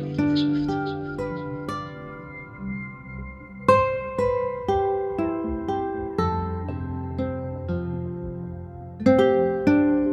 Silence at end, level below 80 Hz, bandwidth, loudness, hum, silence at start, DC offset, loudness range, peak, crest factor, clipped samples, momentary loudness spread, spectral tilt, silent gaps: 0 s; -44 dBFS; 10 kHz; -25 LUFS; none; 0 s; under 0.1%; 5 LU; -4 dBFS; 22 dB; under 0.1%; 17 LU; -8 dB/octave; none